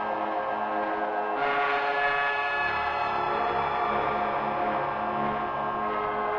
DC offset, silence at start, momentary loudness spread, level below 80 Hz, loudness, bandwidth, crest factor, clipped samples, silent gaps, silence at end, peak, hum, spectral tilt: under 0.1%; 0 s; 4 LU; -56 dBFS; -27 LUFS; 7.2 kHz; 14 dB; under 0.1%; none; 0 s; -14 dBFS; none; -6 dB/octave